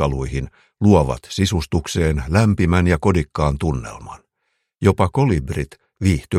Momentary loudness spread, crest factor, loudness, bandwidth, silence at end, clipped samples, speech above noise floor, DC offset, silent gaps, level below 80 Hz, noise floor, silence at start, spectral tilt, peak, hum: 12 LU; 18 dB; -19 LUFS; 14 kHz; 0 s; under 0.1%; 54 dB; under 0.1%; none; -32 dBFS; -72 dBFS; 0 s; -6.5 dB/octave; 0 dBFS; none